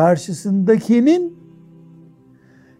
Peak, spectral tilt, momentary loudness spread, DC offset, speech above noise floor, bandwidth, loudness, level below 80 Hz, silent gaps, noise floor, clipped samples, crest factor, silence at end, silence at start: -2 dBFS; -7 dB/octave; 7 LU; under 0.1%; 34 dB; 13 kHz; -16 LUFS; -66 dBFS; none; -49 dBFS; under 0.1%; 16 dB; 1.45 s; 0 s